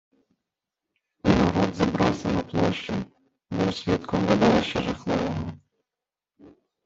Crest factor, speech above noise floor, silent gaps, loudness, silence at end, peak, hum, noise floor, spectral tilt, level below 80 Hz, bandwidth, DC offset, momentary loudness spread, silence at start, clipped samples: 22 dB; 65 dB; none; -24 LUFS; 0.35 s; -4 dBFS; none; -89 dBFS; -6.5 dB/octave; -48 dBFS; 7.8 kHz; under 0.1%; 12 LU; 1.25 s; under 0.1%